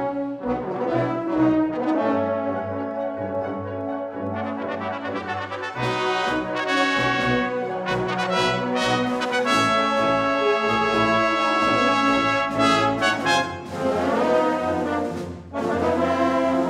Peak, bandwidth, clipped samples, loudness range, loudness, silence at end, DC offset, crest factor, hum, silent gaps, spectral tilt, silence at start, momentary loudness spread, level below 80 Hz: -4 dBFS; 14 kHz; under 0.1%; 7 LU; -22 LUFS; 0 s; under 0.1%; 18 dB; none; none; -5 dB/octave; 0 s; 9 LU; -52 dBFS